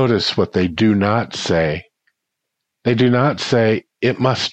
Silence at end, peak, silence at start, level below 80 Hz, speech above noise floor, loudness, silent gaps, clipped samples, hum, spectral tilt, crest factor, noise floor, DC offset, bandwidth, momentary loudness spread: 0 s; -2 dBFS; 0 s; -48 dBFS; 62 dB; -17 LUFS; none; under 0.1%; none; -6 dB/octave; 16 dB; -78 dBFS; under 0.1%; 8.6 kHz; 6 LU